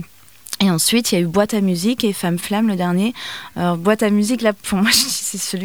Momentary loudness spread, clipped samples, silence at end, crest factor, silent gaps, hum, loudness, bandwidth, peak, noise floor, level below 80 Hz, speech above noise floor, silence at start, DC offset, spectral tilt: 8 LU; under 0.1%; 0 s; 16 dB; none; none; -17 LUFS; over 20 kHz; -2 dBFS; -43 dBFS; -52 dBFS; 25 dB; 0 s; 0.4%; -4 dB/octave